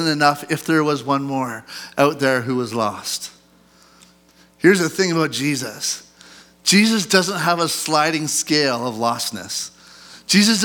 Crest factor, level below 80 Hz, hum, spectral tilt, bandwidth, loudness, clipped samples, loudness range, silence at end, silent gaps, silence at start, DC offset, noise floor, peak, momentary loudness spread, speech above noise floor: 20 dB; -66 dBFS; none; -3.5 dB/octave; 19.5 kHz; -19 LUFS; under 0.1%; 4 LU; 0 s; none; 0 s; under 0.1%; -53 dBFS; 0 dBFS; 11 LU; 34 dB